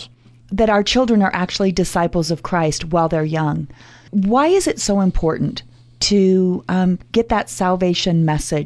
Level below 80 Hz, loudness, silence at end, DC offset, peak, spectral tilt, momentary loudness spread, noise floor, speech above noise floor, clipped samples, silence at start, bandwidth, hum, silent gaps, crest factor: -34 dBFS; -17 LUFS; 0 s; under 0.1%; -4 dBFS; -5.5 dB/octave; 7 LU; -42 dBFS; 25 dB; under 0.1%; 0 s; 11 kHz; none; none; 14 dB